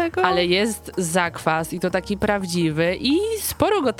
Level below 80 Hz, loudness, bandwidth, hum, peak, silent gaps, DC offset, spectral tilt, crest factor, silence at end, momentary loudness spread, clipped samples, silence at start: -46 dBFS; -21 LUFS; 18.5 kHz; none; -2 dBFS; none; under 0.1%; -4.5 dB/octave; 20 dB; 0 s; 5 LU; under 0.1%; 0 s